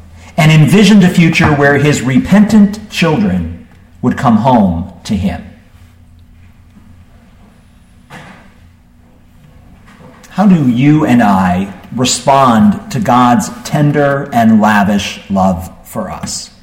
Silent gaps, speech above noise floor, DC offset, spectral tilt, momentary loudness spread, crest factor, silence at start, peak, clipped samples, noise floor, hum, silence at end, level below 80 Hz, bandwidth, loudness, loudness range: none; 33 dB; under 0.1%; -6 dB/octave; 14 LU; 12 dB; 0.25 s; 0 dBFS; under 0.1%; -43 dBFS; 60 Hz at -35 dBFS; 0.15 s; -38 dBFS; 16 kHz; -10 LUFS; 9 LU